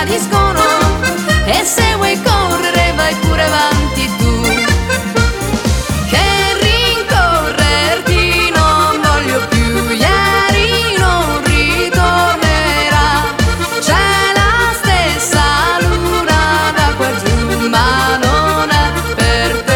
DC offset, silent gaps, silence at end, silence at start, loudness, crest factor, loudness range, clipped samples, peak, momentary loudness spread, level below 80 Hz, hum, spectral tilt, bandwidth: under 0.1%; none; 0 s; 0 s; -12 LUFS; 12 dB; 2 LU; under 0.1%; 0 dBFS; 4 LU; -20 dBFS; none; -4 dB/octave; 18.5 kHz